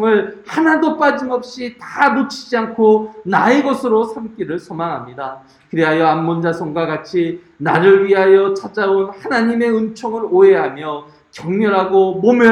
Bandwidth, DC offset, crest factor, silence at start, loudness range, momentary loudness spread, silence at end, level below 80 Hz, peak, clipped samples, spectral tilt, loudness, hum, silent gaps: 10.5 kHz; under 0.1%; 14 dB; 0 s; 4 LU; 14 LU; 0 s; -60 dBFS; 0 dBFS; under 0.1%; -6.5 dB/octave; -15 LUFS; none; none